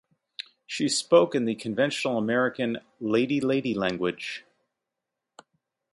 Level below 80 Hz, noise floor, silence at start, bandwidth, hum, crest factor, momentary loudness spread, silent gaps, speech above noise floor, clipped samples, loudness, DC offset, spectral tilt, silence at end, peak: -68 dBFS; -85 dBFS; 0.7 s; 11.5 kHz; none; 20 dB; 18 LU; none; 60 dB; under 0.1%; -26 LUFS; under 0.1%; -4.5 dB/octave; 1.55 s; -6 dBFS